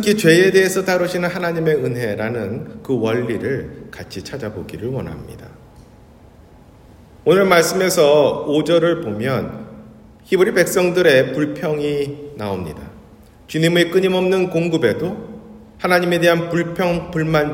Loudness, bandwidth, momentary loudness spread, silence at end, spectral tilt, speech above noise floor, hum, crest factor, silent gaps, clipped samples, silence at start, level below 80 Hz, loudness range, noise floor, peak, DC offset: -17 LUFS; 16.5 kHz; 17 LU; 0 s; -5 dB/octave; 28 dB; none; 18 dB; none; under 0.1%; 0 s; -50 dBFS; 8 LU; -45 dBFS; 0 dBFS; under 0.1%